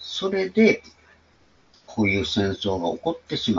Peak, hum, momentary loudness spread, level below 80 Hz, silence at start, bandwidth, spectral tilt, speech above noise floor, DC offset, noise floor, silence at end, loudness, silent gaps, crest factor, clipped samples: -6 dBFS; none; 9 LU; -54 dBFS; 0 s; 7.6 kHz; -5.5 dB/octave; 36 dB; under 0.1%; -59 dBFS; 0 s; -23 LUFS; none; 20 dB; under 0.1%